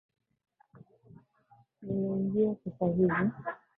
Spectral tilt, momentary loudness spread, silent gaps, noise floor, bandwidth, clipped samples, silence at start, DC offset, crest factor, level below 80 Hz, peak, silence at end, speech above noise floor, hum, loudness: -12 dB/octave; 10 LU; none; -65 dBFS; 3.7 kHz; under 0.1%; 1.8 s; under 0.1%; 18 dB; -66 dBFS; -16 dBFS; 0.2 s; 35 dB; none; -31 LUFS